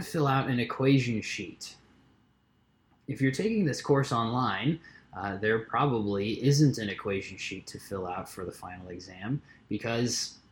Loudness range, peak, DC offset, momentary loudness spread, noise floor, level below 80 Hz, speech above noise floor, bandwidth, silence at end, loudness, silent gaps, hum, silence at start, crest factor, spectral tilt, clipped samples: 6 LU; -12 dBFS; under 0.1%; 16 LU; -68 dBFS; -62 dBFS; 38 dB; 18 kHz; 0.15 s; -29 LUFS; none; none; 0 s; 18 dB; -5.5 dB/octave; under 0.1%